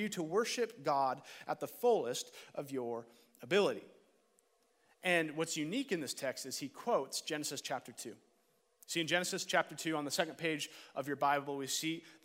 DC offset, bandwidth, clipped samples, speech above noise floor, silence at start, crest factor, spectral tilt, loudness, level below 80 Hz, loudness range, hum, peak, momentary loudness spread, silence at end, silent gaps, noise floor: under 0.1%; 16 kHz; under 0.1%; 38 dB; 0 s; 22 dB; -3 dB/octave; -37 LUFS; -90 dBFS; 3 LU; none; -16 dBFS; 10 LU; 0.1 s; none; -75 dBFS